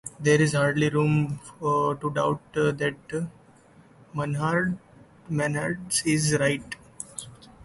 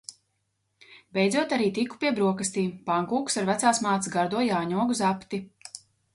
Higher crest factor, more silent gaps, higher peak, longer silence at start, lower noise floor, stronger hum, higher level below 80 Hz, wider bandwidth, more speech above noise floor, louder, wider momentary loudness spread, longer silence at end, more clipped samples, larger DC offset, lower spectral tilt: about the same, 18 dB vs 20 dB; neither; about the same, -8 dBFS vs -8 dBFS; about the same, 0.05 s vs 0.1 s; second, -54 dBFS vs -76 dBFS; neither; first, -58 dBFS vs -68 dBFS; about the same, 12 kHz vs 11.5 kHz; second, 30 dB vs 50 dB; about the same, -25 LUFS vs -26 LUFS; about the same, 15 LU vs 13 LU; about the same, 0.3 s vs 0.35 s; neither; neither; about the same, -5 dB/octave vs -4.5 dB/octave